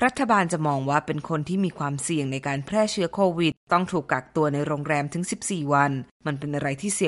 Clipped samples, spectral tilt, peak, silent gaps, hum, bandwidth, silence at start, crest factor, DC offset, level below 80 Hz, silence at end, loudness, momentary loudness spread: under 0.1%; -5 dB/octave; -6 dBFS; 3.57-3.67 s, 6.11-6.20 s; none; 11.5 kHz; 0 s; 18 dB; under 0.1%; -58 dBFS; 0 s; -25 LUFS; 7 LU